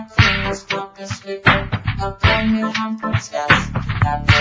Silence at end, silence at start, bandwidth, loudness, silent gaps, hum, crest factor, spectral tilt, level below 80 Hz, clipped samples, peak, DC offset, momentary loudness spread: 0 s; 0 s; 8 kHz; -18 LUFS; none; none; 18 dB; -5 dB/octave; -30 dBFS; under 0.1%; 0 dBFS; under 0.1%; 9 LU